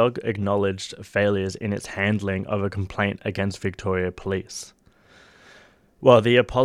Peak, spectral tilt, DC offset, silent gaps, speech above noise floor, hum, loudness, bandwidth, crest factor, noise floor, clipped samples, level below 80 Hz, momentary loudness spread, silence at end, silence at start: -2 dBFS; -6 dB/octave; under 0.1%; none; 31 dB; none; -23 LUFS; 13.5 kHz; 22 dB; -54 dBFS; under 0.1%; -52 dBFS; 12 LU; 0 s; 0 s